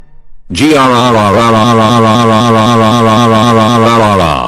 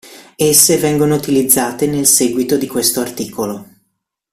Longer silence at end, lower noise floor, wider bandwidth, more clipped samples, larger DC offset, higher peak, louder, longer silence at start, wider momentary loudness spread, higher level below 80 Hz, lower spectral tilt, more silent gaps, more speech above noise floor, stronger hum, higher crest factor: second, 0 s vs 0.7 s; second, -28 dBFS vs -69 dBFS; second, 14.5 kHz vs over 20 kHz; first, 0.3% vs under 0.1%; neither; about the same, 0 dBFS vs 0 dBFS; first, -7 LUFS vs -13 LUFS; about the same, 0 s vs 0.05 s; second, 1 LU vs 13 LU; first, -36 dBFS vs -50 dBFS; first, -5.5 dB/octave vs -3.5 dB/octave; neither; second, 22 dB vs 55 dB; neither; second, 6 dB vs 16 dB